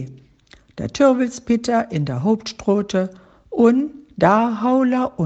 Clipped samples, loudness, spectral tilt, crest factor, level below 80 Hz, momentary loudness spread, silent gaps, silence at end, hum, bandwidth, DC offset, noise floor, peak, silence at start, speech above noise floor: under 0.1%; -19 LUFS; -6.5 dB/octave; 18 dB; -52 dBFS; 13 LU; none; 0 s; none; 8.4 kHz; under 0.1%; -51 dBFS; 0 dBFS; 0 s; 33 dB